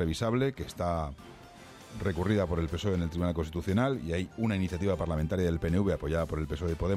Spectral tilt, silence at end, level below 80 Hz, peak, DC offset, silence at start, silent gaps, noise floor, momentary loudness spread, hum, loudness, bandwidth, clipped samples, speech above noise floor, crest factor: -7 dB/octave; 0 s; -46 dBFS; -16 dBFS; under 0.1%; 0 s; none; -50 dBFS; 9 LU; none; -31 LUFS; 14.5 kHz; under 0.1%; 20 dB; 16 dB